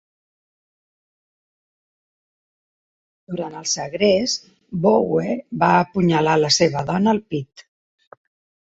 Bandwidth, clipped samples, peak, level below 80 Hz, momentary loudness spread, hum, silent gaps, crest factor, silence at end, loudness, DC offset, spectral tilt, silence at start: 8 kHz; under 0.1%; -2 dBFS; -58 dBFS; 13 LU; none; none; 20 dB; 1.05 s; -19 LUFS; under 0.1%; -4.5 dB/octave; 3.3 s